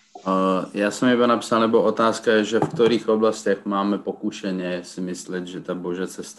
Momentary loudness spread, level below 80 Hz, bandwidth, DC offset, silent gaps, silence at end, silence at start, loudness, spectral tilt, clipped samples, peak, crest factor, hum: 11 LU; -64 dBFS; 12.5 kHz; under 0.1%; none; 0.05 s; 0.15 s; -22 LUFS; -5 dB/octave; under 0.1%; -6 dBFS; 16 dB; none